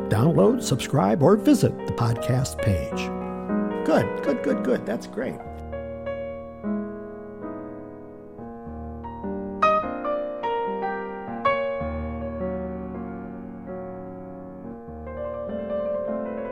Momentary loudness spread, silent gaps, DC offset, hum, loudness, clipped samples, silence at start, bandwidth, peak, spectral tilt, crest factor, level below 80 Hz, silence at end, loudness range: 18 LU; none; 0.2%; none; -25 LUFS; under 0.1%; 0 s; 16.5 kHz; -6 dBFS; -6.5 dB/octave; 20 dB; -46 dBFS; 0 s; 12 LU